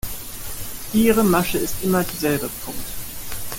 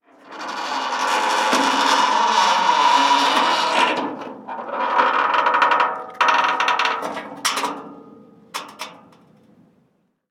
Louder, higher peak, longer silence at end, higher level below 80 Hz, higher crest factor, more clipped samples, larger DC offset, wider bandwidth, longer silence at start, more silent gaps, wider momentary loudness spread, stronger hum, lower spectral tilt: second, -22 LUFS vs -18 LUFS; about the same, -4 dBFS vs -4 dBFS; second, 0 s vs 1.35 s; first, -40 dBFS vs -80 dBFS; about the same, 18 dB vs 18 dB; neither; neither; about the same, 17 kHz vs 16.5 kHz; second, 0.05 s vs 0.25 s; neither; second, 14 LU vs 17 LU; neither; first, -4.5 dB/octave vs -1 dB/octave